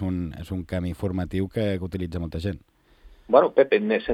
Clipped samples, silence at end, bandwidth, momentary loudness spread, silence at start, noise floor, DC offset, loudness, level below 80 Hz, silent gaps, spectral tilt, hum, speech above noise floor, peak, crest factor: under 0.1%; 0 s; 13.5 kHz; 12 LU; 0 s; -52 dBFS; under 0.1%; -25 LUFS; -48 dBFS; none; -8 dB/octave; none; 28 dB; -2 dBFS; 22 dB